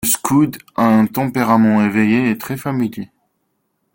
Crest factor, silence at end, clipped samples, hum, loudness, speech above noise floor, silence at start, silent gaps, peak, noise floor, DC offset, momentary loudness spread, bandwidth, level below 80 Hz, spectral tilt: 14 dB; 0.9 s; under 0.1%; none; -16 LUFS; 53 dB; 0 s; none; -2 dBFS; -68 dBFS; under 0.1%; 9 LU; 17 kHz; -54 dBFS; -5.5 dB/octave